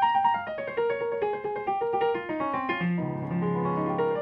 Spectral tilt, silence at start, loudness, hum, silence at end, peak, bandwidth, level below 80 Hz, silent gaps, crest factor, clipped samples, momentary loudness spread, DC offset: -9.5 dB/octave; 0 s; -28 LUFS; none; 0 s; -12 dBFS; 5.4 kHz; -64 dBFS; none; 14 dB; under 0.1%; 4 LU; under 0.1%